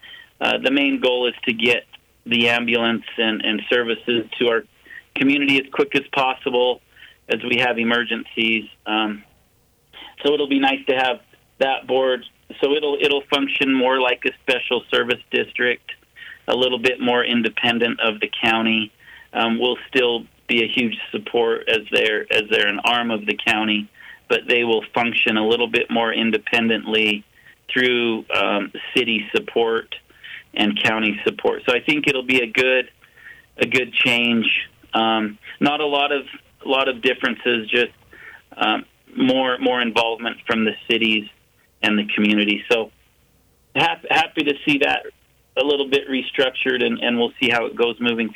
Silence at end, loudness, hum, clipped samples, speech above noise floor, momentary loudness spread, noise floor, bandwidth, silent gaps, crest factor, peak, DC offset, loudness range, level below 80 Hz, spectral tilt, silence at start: 0 s; -19 LUFS; none; under 0.1%; 40 dB; 7 LU; -60 dBFS; 16.5 kHz; none; 16 dB; -4 dBFS; under 0.1%; 2 LU; -62 dBFS; -4.5 dB/octave; 0.05 s